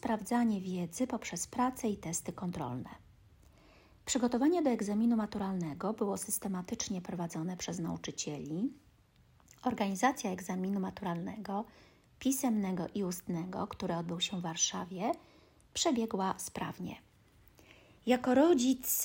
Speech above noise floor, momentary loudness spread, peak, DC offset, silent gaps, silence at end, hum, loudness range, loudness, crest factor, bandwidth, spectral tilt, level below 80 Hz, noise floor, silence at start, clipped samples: 31 dB; 10 LU; -16 dBFS; under 0.1%; none; 0 s; none; 5 LU; -34 LUFS; 20 dB; 16.5 kHz; -4.5 dB/octave; -66 dBFS; -65 dBFS; 0.05 s; under 0.1%